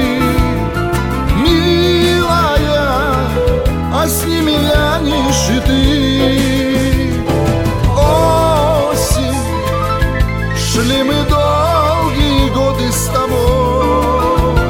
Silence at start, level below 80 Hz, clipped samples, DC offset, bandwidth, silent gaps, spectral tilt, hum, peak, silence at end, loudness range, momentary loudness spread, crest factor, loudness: 0 s; -20 dBFS; under 0.1%; under 0.1%; 18.5 kHz; none; -5 dB/octave; none; 0 dBFS; 0 s; 1 LU; 5 LU; 12 dB; -13 LUFS